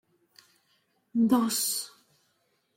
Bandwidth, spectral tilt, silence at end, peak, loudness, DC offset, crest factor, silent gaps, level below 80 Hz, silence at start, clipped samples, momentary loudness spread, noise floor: 16.5 kHz; -3 dB/octave; 0.9 s; -12 dBFS; -27 LUFS; under 0.1%; 20 dB; none; -74 dBFS; 1.15 s; under 0.1%; 10 LU; -73 dBFS